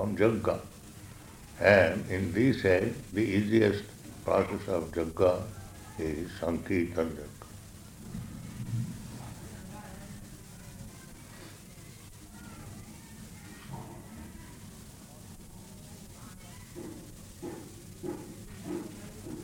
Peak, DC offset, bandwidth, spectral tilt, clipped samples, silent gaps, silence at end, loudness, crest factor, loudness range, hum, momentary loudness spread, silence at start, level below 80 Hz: -8 dBFS; under 0.1%; 17 kHz; -6 dB/octave; under 0.1%; none; 0 s; -30 LUFS; 24 dB; 20 LU; none; 22 LU; 0 s; -54 dBFS